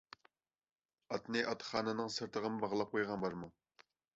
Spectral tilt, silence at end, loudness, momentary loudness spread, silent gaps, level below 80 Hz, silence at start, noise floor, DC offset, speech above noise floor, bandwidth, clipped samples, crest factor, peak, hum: -3 dB/octave; 0.65 s; -39 LUFS; 13 LU; none; -74 dBFS; 1.1 s; -75 dBFS; under 0.1%; 36 dB; 7.6 kHz; under 0.1%; 22 dB; -20 dBFS; none